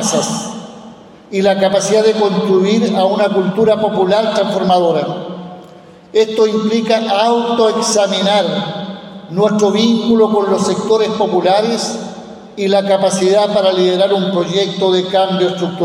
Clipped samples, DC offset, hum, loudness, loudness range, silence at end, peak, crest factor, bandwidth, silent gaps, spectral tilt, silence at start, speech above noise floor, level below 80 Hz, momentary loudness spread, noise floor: under 0.1%; under 0.1%; none; -13 LUFS; 2 LU; 0 s; -2 dBFS; 12 dB; 14.5 kHz; none; -4.5 dB/octave; 0 s; 26 dB; -58 dBFS; 11 LU; -39 dBFS